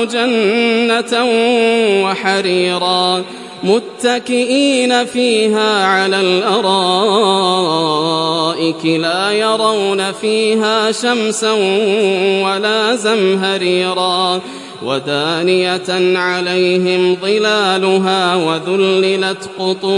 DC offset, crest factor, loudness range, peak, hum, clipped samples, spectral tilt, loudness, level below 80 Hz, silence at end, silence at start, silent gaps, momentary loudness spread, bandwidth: under 0.1%; 14 dB; 2 LU; 0 dBFS; none; under 0.1%; -4 dB/octave; -13 LUFS; -68 dBFS; 0 s; 0 s; none; 4 LU; 11.5 kHz